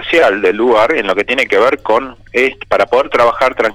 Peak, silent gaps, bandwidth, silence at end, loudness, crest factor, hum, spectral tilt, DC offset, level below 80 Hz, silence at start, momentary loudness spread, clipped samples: -2 dBFS; none; 14.5 kHz; 0 s; -12 LUFS; 10 dB; none; -4 dB/octave; under 0.1%; -44 dBFS; 0 s; 4 LU; under 0.1%